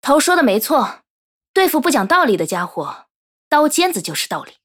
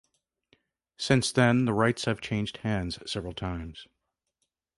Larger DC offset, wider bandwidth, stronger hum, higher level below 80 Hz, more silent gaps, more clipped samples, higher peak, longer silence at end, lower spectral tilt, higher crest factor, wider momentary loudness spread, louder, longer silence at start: neither; first, 20 kHz vs 11.5 kHz; neither; second, -62 dBFS vs -50 dBFS; first, 1.10-1.41 s, 1.48-1.54 s, 3.10-3.51 s vs none; neither; first, -2 dBFS vs -8 dBFS; second, 0.2 s vs 0.95 s; second, -3 dB/octave vs -5.5 dB/octave; about the same, 16 dB vs 20 dB; about the same, 11 LU vs 13 LU; first, -16 LUFS vs -28 LUFS; second, 0.05 s vs 1 s